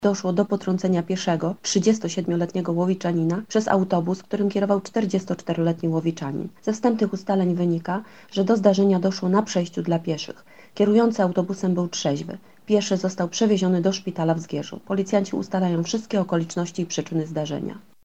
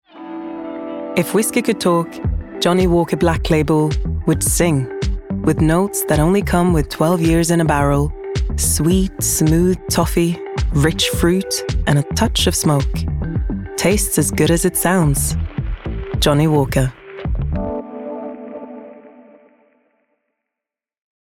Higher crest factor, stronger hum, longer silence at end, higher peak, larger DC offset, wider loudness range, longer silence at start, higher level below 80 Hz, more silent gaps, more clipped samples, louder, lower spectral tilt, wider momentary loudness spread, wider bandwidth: about the same, 20 dB vs 16 dB; neither; second, 0.25 s vs 2.15 s; about the same, -4 dBFS vs -2 dBFS; first, 0.2% vs under 0.1%; about the same, 3 LU vs 5 LU; second, 0 s vs 0.15 s; second, -70 dBFS vs -28 dBFS; neither; neither; second, -23 LUFS vs -17 LUFS; about the same, -6 dB/octave vs -5 dB/octave; second, 9 LU vs 12 LU; second, 8.4 kHz vs 17.5 kHz